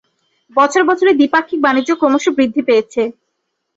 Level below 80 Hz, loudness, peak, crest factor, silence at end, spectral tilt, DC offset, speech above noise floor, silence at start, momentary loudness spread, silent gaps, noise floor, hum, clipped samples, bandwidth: -60 dBFS; -14 LUFS; 0 dBFS; 14 dB; 0.65 s; -3.5 dB/octave; under 0.1%; 58 dB; 0.55 s; 8 LU; none; -71 dBFS; none; under 0.1%; 8 kHz